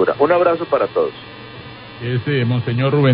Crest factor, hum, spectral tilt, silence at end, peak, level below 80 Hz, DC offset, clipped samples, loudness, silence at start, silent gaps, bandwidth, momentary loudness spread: 16 dB; none; -12.5 dB/octave; 0 s; -2 dBFS; -50 dBFS; under 0.1%; under 0.1%; -17 LUFS; 0 s; none; 5.2 kHz; 20 LU